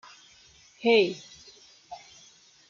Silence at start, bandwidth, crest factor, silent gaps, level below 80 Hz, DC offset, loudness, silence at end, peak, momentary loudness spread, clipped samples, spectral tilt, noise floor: 0.85 s; 7.4 kHz; 20 dB; none; -74 dBFS; under 0.1%; -24 LUFS; 0.75 s; -10 dBFS; 25 LU; under 0.1%; -4 dB/octave; -57 dBFS